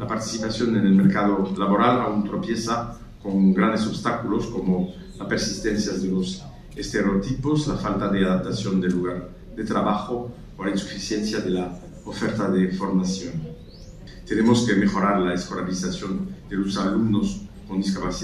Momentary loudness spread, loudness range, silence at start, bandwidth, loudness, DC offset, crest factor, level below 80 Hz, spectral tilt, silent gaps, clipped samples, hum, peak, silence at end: 15 LU; 4 LU; 0 s; 11.5 kHz; -23 LUFS; under 0.1%; 18 dB; -44 dBFS; -6 dB/octave; none; under 0.1%; none; -6 dBFS; 0 s